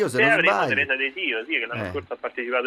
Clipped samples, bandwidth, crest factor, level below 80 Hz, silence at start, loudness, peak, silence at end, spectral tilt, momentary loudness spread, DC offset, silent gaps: under 0.1%; 13.5 kHz; 18 dB; -62 dBFS; 0 s; -22 LUFS; -6 dBFS; 0 s; -4.5 dB/octave; 13 LU; under 0.1%; none